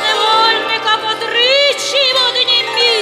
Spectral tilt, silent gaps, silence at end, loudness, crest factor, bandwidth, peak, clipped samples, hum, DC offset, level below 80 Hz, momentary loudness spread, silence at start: 0 dB/octave; none; 0 s; -11 LUFS; 12 dB; 15.5 kHz; -2 dBFS; under 0.1%; none; under 0.1%; -62 dBFS; 4 LU; 0 s